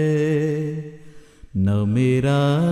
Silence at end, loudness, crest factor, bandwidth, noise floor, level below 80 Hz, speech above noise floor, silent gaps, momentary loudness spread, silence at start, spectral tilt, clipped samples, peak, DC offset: 0 s; -20 LUFS; 14 dB; 11 kHz; -42 dBFS; -52 dBFS; 24 dB; none; 12 LU; 0 s; -8 dB/octave; under 0.1%; -6 dBFS; under 0.1%